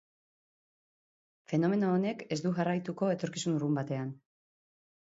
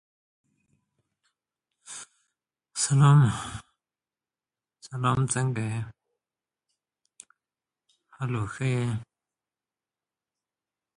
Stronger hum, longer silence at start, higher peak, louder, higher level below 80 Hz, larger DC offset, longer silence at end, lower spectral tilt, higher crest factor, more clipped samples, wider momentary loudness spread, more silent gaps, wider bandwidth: neither; second, 1.5 s vs 1.9 s; second, -18 dBFS vs -8 dBFS; second, -32 LUFS vs -25 LUFS; second, -76 dBFS vs -58 dBFS; neither; second, 0.9 s vs 1.95 s; about the same, -6.5 dB/octave vs -5.5 dB/octave; second, 16 dB vs 22 dB; neither; second, 6 LU vs 23 LU; neither; second, 7.8 kHz vs 11.5 kHz